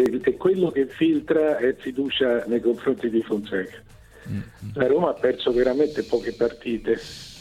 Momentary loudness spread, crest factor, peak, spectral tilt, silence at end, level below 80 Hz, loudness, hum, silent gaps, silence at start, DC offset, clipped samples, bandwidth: 10 LU; 16 dB; -8 dBFS; -6.5 dB/octave; 0 s; -52 dBFS; -23 LUFS; none; none; 0 s; under 0.1%; under 0.1%; 13 kHz